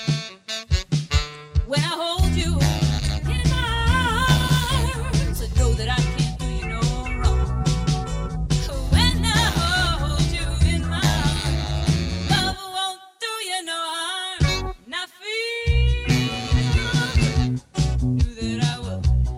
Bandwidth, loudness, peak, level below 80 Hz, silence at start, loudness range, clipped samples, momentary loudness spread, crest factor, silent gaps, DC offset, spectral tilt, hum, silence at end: 16 kHz; -22 LUFS; -4 dBFS; -26 dBFS; 0 s; 3 LU; under 0.1%; 7 LU; 18 dB; none; under 0.1%; -4.5 dB/octave; none; 0 s